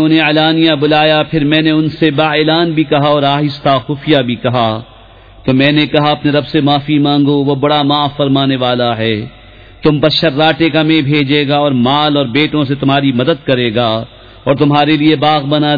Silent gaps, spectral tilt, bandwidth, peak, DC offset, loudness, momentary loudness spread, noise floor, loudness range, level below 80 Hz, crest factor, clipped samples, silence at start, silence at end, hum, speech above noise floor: none; -8 dB/octave; 5 kHz; 0 dBFS; 0.2%; -11 LUFS; 5 LU; -38 dBFS; 2 LU; -42 dBFS; 12 dB; under 0.1%; 0 s; 0 s; none; 27 dB